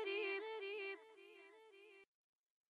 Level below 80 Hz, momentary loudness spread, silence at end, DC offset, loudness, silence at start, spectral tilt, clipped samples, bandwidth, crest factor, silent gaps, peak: under -90 dBFS; 21 LU; 0.65 s; under 0.1%; -46 LUFS; 0 s; -2 dB/octave; under 0.1%; 10.5 kHz; 18 dB; none; -32 dBFS